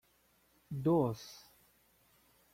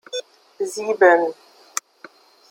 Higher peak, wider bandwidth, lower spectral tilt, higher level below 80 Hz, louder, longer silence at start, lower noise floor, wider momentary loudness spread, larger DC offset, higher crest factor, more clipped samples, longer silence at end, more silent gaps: second, -20 dBFS vs -2 dBFS; about the same, 16 kHz vs 16.5 kHz; first, -8 dB/octave vs -2 dB/octave; first, -70 dBFS vs -78 dBFS; second, -35 LUFS vs -20 LUFS; first, 0.7 s vs 0.15 s; first, -72 dBFS vs -48 dBFS; first, 21 LU vs 16 LU; neither; about the same, 20 dB vs 20 dB; neither; about the same, 1.2 s vs 1.2 s; neither